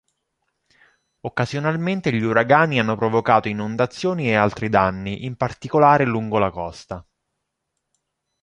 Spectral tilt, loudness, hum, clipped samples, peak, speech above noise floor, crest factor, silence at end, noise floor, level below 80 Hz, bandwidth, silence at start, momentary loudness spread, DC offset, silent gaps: -7 dB/octave; -20 LUFS; none; under 0.1%; -2 dBFS; 58 dB; 20 dB; 1.4 s; -78 dBFS; -50 dBFS; 10.5 kHz; 1.25 s; 13 LU; under 0.1%; none